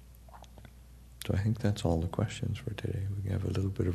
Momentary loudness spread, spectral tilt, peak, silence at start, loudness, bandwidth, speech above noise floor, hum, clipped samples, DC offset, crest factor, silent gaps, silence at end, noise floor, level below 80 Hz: 22 LU; -7 dB/octave; -14 dBFS; 0 s; -33 LUFS; 13.5 kHz; 21 dB; none; under 0.1%; under 0.1%; 18 dB; none; 0 s; -53 dBFS; -48 dBFS